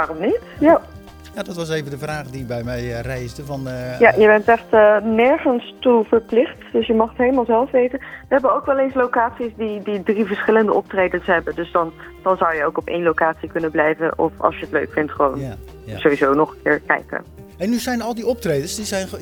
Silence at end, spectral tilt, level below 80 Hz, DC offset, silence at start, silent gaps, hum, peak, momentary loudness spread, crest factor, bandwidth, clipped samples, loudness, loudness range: 0 s; -5.5 dB/octave; -44 dBFS; under 0.1%; 0 s; none; none; 0 dBFS; 13 LU; 18 dB; 19.5 kHz; under 0.1%; -18 LUFS; 5 LU